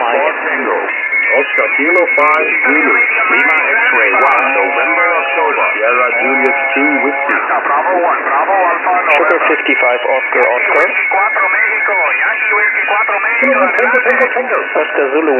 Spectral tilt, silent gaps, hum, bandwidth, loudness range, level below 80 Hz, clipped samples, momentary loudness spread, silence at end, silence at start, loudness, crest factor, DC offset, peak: -4 dB/octave; none; none; 8.2 kHz; 2 LU; -74 dBFS; under 0.1%; 4 LU; 0 s; 0 s; -10 LUFS; 12 dB; under 0.1%; 0 dBFS